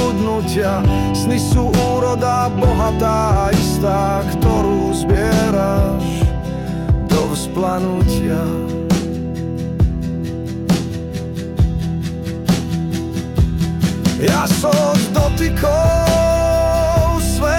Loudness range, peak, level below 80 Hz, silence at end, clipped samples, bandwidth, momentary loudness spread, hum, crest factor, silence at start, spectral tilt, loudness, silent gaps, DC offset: 5 LU; -4 dBFS; -24 dBFS; 0 s; under 0.1%; 17.5 kHz; 8 LU; none; 12 dB; 0 s; -6 dB/octave; -17 LUFS; none; under 0.1%